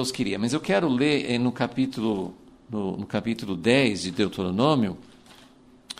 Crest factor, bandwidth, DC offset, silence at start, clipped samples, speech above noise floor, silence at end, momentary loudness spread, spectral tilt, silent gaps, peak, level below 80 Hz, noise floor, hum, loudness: 18 dB; 15 kHz; under 0.1%; 0 s; under 0.1%; 29 dB; 0.05 s; 9 LU; -5.5 dB/octave; none; -8 dBFS; -58 dBFS; -53 dBFS; none; -25 LUFS